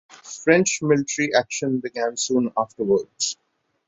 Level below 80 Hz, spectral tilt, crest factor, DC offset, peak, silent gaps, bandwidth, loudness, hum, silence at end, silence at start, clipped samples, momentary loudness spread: -66 dBFS; -3.5 dB/octave; 20 dB; under 0.1%; -2 dBFS; none; 8.2 kHz; -22 LUFS; none; 0.55 s; 0.25 s; under 0.1%; 8 LU